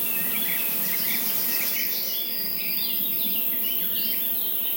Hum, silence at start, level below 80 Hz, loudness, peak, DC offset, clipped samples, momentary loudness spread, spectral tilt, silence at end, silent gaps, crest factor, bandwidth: none; 0 s; -80 dBFS; -22 LUFS; -10 dBFS; under 0.1%; under 0.1%; 2 LU; -1 dB/octave; 0 s; none; 14 dB; 16.5 kHz